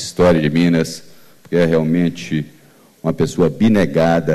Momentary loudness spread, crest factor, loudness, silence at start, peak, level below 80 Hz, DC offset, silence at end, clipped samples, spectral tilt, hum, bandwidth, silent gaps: 11 LU; 12 dB; -16 LUFS; 0 s; -4 dBFS; -44 dBFS; under 0.1%; 0 s; under 0.1%; -6.5 dB/octave; none; 13.5 kHz; none